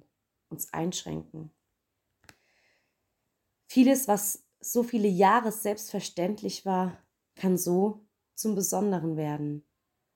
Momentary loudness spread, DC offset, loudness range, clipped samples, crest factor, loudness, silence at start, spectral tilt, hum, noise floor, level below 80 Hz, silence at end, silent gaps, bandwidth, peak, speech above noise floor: 16 LU; under 0.1%; 13 LU; under 0.1%; 20 dB; -28 LUFS; 0.5 s; -5 dB/octave; none; -81 dBFS; -70 dBFS; 0.55 s; none; 17 kHz; -10 dBFS; 54 dB